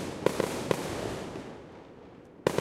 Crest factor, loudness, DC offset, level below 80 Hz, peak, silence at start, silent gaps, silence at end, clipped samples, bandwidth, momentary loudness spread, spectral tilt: 26 dB; -33 LUFS; under 0.1%; -56 dBFS; -8 dBFS; 0 s; none; 0 s; under 0.1%; 16 kHz; 20 LU; -5 dB/octave